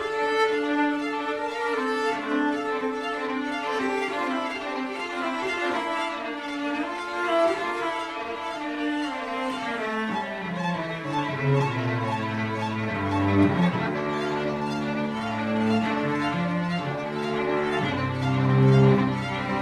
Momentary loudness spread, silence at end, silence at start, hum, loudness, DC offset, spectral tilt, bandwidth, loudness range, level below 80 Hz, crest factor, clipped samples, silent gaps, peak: 7 LU; 0 s; 0 s; none; -26 LUFS; under 0.1%; -6.5 dB/octave; 12 kHz; 4 LU; -58 dBFS; 18 dB; under 0.1%; none; -6 dBFS